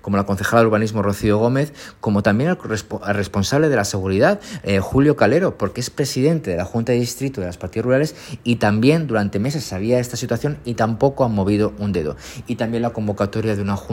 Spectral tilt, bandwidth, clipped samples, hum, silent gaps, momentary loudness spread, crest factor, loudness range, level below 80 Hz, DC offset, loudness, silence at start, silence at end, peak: -6 dB/octave; 16.5 kHz; under 0.1%; none; none; 9 LU; 18 dB; 3 LU; -46 dBFS; under 0.1%; -19 LUFS; 0.05 s; 0 s; -2 dBFS